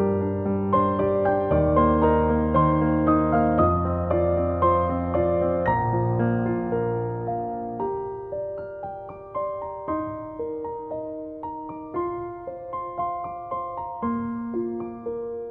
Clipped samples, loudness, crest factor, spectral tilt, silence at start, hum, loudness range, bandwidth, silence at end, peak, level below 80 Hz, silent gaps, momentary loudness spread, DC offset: under 0.1%; -25 LUFS; 16 dB; -12 dB/octave; 0 s; none; 11 LU; 4 kHz; 0 s; -8 dBFS; -40 dBFS; none; 13 LU; under 0.1%